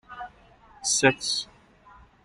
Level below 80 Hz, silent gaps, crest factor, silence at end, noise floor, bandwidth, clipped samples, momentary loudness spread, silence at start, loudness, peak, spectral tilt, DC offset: -60 dBFS; none; 24 dB; 0.8 s; -54 dBFS; 13 kHz; under 0.1%; 21 LU; 0.1 s; -24 LUFS; -6 dBFS; -2 dB/octave; under 0.1%